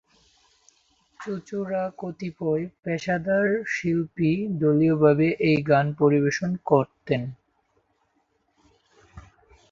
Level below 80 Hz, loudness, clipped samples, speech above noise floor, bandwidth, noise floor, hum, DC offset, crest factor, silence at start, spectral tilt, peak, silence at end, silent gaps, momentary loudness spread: -60 dBFS; -24 LUFS; under 0.1%; 47 dB; 7.4 kHz; -70 dBFS; none; under 0.1%; 20 dB; 1.2 s; -7.5 dB/octave; -4 dBFS; 0.5 s; none; 12 LU